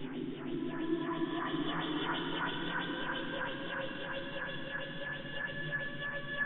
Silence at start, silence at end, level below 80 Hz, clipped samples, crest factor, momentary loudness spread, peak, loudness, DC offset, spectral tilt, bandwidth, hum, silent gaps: 0 s; 0 s; -60 dBFS; under 0.1%; 14 dB; 5 LU; -22 dBFS; -37 LUFS; under 0.1%; -8.5 dB/octave; 4.4 kHz; none; none